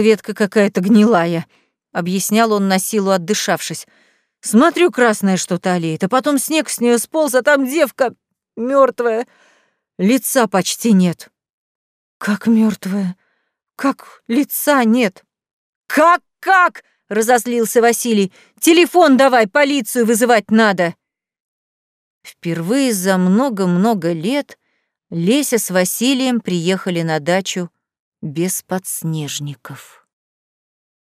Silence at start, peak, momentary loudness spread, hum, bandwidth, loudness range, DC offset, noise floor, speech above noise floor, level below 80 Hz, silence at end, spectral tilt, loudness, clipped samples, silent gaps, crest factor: 0 s; -2 dBFS; 11 LU; none; 16 kHz; 6 LU; under 0.1%; -69 dBFS; 54 dB; -72 dBFS; 1.25 s; -4.5 dB/octave; -16 LUFS; under 0.1%; 11.50-12.20 s, 15.53-15.82 s, 21.40-22.21 s, 27.99-28.12 s; 14 dB